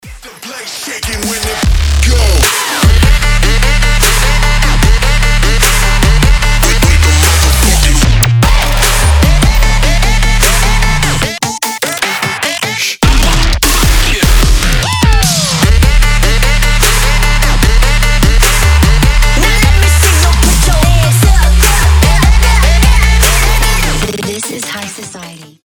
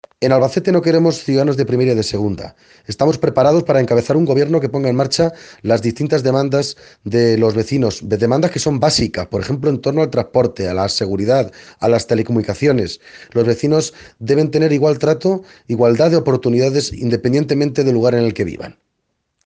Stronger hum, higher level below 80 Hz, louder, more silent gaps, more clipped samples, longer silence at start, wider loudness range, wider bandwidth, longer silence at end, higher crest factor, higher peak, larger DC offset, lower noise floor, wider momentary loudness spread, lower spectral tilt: neither; first, -10 dBFS vs -48 dBFS; first, -9 LUFS vs -16 LUFS; neither; neither; second, 0.05 s vs 0.2 s; about the same, 3 LU vs 2 LU; first, over 20 kHz vs 9.8 kHz; second, 0.2 s vs 0.75 s; second, 8 dB vs 16 dB; about the same, 0 dBFS vs 0 dBFS; neither; second, -29 dBFS vs -71 dBFS; about the same, 7 LU vs 8 LU; second, -3.5 dB/octave vs -6 dB/octave